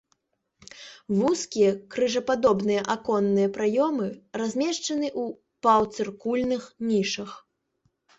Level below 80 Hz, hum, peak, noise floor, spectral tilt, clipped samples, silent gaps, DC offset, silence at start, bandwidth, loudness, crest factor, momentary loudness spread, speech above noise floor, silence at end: -64 dBFS; none; -8 dBFS; -72 dBFS; -5 dB/octave; under 0.1%; none; under 0.1%; 0.75 s; 8.2 kHz; -25 LUFS; 18 dB; 10 LU; 48 dB; 0.8 s